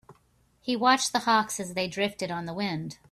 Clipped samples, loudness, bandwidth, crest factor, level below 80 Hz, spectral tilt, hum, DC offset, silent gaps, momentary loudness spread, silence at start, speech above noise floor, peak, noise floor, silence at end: under 0.1%; -27 LUFS; 15 kHz; 18 dB; -66 dBFS; -3 dB/octave; none; under 0.1%; none; 10 LU; 0.1 s; 38 dB; -10 dBFS; -65 dBFS; 0.15 s